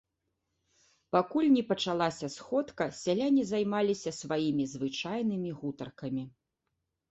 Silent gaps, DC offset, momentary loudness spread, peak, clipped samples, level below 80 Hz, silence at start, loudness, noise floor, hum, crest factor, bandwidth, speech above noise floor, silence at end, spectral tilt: none; under 0.1%; 11 LU; -12 dBFS; under 0.1%; -70 dBFS; 1.15 s; -31 LUFS; -84 dBFS; none; 20 dB; 8.2 kHz; 53 dB; 0.8 s; -5.5 dB/octave